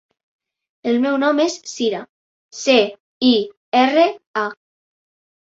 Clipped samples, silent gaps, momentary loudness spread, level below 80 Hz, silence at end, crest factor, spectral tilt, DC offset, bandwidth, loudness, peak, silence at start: under 0.1%; 2.09-2.49 s, 3.00-3.21 s, 3.57-3.72 s, 4.27-4.34 s; 10 LU; -68 dBFS; 1.05 s; 18 dB; -3 dB/octave; under 0.1%; 7.8 kHz; -18 LUFS; -2 dBFS; 0.85 s